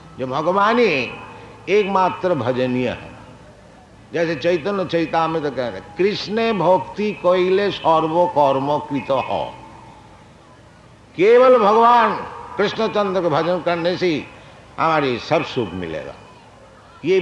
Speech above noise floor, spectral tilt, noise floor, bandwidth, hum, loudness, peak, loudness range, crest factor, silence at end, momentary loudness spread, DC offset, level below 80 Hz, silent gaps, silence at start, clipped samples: 28 dB; -6.5 dB/octave; -46 dBFS; 10 kHz; none; -18 LUFS; -4 dBFS; 6 LU; 16 dB; 0 s; 15 LU; under 0.1%; -54 dBFS; none; 0.05 s; under 0.1%